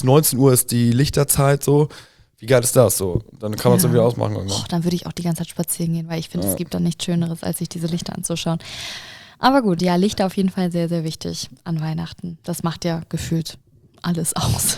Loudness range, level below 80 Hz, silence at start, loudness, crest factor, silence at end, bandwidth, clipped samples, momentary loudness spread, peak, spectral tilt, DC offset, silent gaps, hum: 7 LU; -44 dBFS; 0 s; -20 LUFS; 18 dB; 0 s; over 20 kHz; under 0.1%; 13 LU; -2 dBFS; -5 dB/octave; under 0.1%; none; none